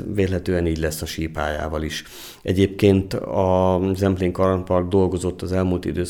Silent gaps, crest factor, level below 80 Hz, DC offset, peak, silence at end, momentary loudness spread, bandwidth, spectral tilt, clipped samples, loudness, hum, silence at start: none; 18 dB; -38 dBFS; under 0.1%; -4 dBFS; 0 s; 9 LU; 18.5 kHz; -6.5 dB/octave; under 0.1%; -21 LUFS; none; 0 s